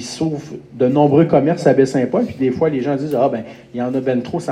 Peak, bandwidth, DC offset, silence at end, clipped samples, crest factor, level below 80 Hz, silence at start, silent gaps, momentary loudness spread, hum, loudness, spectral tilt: 0 dBFS; 13 kHz; under 0.1%; 0 s; under 0.1%; 16 dB; -56 dBFS; 0 s; none; 12 LU; none; -17 LUFS; -7.5 dB/octave